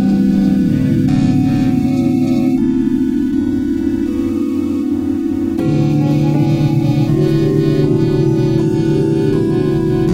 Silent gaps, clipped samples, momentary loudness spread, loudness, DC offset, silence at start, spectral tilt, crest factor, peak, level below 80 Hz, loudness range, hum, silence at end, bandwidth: none; under 0.1%; 4 LU; -14 LUFS; under 0.1%; 0 s; -9 dB/octave; 12 dB; -2 dBFS; -34 dBFS; 2 LU; none; 0 s; 15 kHz